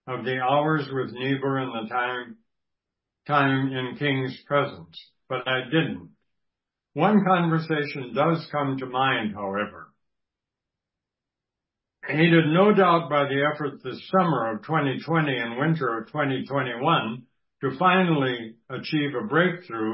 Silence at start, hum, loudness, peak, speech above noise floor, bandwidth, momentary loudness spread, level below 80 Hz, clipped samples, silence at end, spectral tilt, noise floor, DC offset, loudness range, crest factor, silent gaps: 0.05 s; none; -24 LUFS; -6 dBFS; 63 dB; 5.8 kHz; 12 LU; -68 dBFS; under 0.1%; 0 s; -11 dB/octave; -87 dBFS; under 0.1%; 6 LU; 20 dB; none